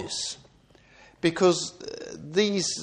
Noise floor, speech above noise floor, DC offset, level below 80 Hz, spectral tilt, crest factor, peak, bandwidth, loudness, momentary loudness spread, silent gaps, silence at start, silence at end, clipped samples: -57 dBFS; 32 dB; under 0.1%; -64 dBFS; -3.5 dB/octave; 18 dB; -10 dBFS; 10.5 kHz; -26 LUFS; 16 LU; none; 0 s; 0 s; under 0.1%